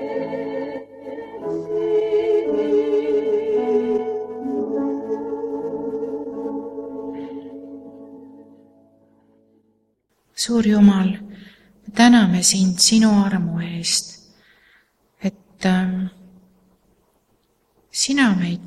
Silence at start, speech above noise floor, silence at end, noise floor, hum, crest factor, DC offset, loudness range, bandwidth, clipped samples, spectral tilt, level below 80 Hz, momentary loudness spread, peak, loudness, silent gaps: 0 s; 51 dB; 0 s; -67 dBFS; none; 20 dB; under 0.1%; 15 LU; 14 kHz; under 0.1%; -4.5 dB/octave; -58 dBFS; 20 LU; -2 dBFS; -20 LUFS; none